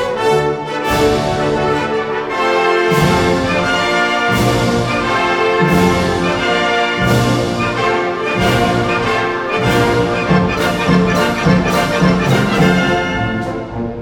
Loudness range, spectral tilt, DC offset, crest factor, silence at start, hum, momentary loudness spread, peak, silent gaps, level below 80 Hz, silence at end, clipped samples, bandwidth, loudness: 1 LU; -5.5 dB/octave; under 0.1%; 14 dB; 0 s; none; 5 LU; 0 dBFS; none; -34 dBFS; 0 s; under 0.1%; 19 kHz; -14 LUFS